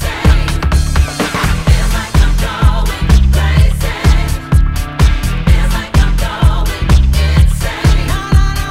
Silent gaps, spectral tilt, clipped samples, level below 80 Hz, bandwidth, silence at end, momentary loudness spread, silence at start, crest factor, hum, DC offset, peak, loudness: none; -5.5 dB/octave; 0.7%; -12 dBFS; 16 kHz; 0 s; 4 LU; 0 s; 10 dB; none; under 0.1%; 0 dBFS; -13 LUFS